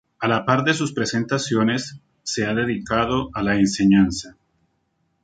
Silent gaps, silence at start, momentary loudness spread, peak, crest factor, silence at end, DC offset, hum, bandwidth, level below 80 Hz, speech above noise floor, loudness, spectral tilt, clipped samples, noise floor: none; 0.2 s; 10 LU; -2 dBFS; 20 dB; 0.95 s; under 0.1%; none; 9.4 kHz; -48 dBFS; 49 dB; -21 LUFS; -5 dB/octave; under 0.1%; -69 dBFS